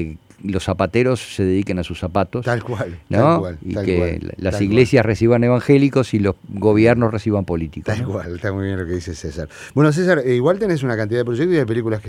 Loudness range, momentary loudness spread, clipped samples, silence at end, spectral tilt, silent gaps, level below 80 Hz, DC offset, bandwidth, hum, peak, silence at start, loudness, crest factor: 5 LU; 11 LU; under 0.1%; 0 s; -7.5 dB/octave; none; -44 dBFS; under 0.1%; 13 kHz; none; 0 dBFS; 0 s; -18 LUFS; 18 dB